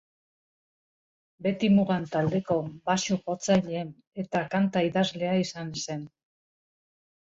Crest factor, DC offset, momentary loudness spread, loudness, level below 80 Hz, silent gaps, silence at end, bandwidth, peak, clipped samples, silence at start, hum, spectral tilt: 18 dB; under 0.1%; 12 LU; -27 LUFS; -64 dBFS; 4.07-4.11 s; 1.2 s; 7.8 kHz; -10 dBFS; under 0.1%; 1.4 s; none; -5.5 dB/octave